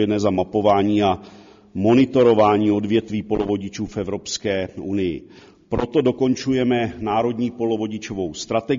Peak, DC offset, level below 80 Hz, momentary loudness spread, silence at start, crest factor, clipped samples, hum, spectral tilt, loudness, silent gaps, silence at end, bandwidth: -4 dBFS; under 0.1%; -48 dBFS; 11 LU; 0 s; 16 dB; under 0.1%; none; -5.5 dB/octave; -20 LUFS; none; 0 s; 7.4 kHz